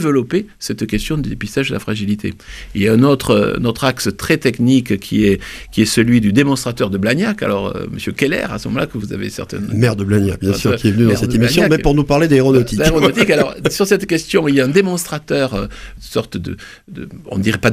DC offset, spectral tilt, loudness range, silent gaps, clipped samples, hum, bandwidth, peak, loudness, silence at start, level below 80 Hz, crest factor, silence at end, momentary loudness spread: under 0.1%; -5.5 dB/octave; 5 LU; none; under 0.1%; none; 16 kHz; 0 dBFS; -15 LUFS; 0 s; -34 dBFS; 16 dB; 0 s; 12 LU